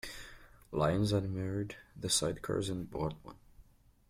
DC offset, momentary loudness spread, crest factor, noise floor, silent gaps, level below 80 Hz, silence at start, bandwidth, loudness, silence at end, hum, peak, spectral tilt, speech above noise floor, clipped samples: under 0.1%; 18 LU; 18 dB; -62 dBFS; none; -56 dBFS; 0.05 s; 16 kHz; -35 LUFS; 0.5 s; none; -18 dBFS; -4.5 dB/octave; 27 dB; under 0.1%